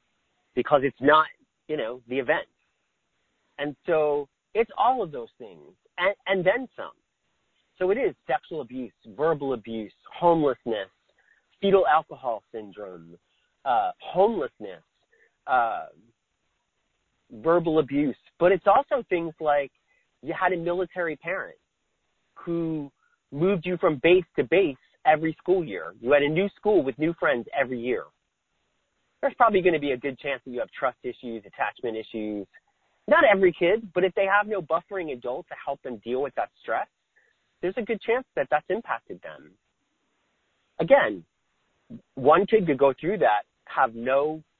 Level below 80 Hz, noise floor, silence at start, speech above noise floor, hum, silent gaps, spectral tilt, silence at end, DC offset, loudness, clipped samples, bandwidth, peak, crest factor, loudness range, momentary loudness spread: -62 dBFS; -76 dBFS; 0.55 s; 51 dB; none; none; -9 dB/octave; 0.2 s; under 0.1%; -25 LUFS; under 0.1%; 4.3 kHz; -4 dBFS; 22 dB; 7 LU; 17 LU